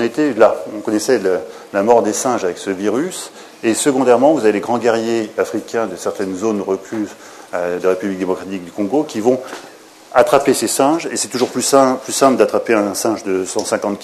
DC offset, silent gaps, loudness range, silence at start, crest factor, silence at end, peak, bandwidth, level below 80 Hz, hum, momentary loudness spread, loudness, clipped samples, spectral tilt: under 0.1%; none; 6 LU; 0 s; 16 dB; 0 s; 0 dBFS; 13.5 kHz; -60 dBFS; none; 10 LU; -16 LUFS; under 0.1%; -4 dB/octave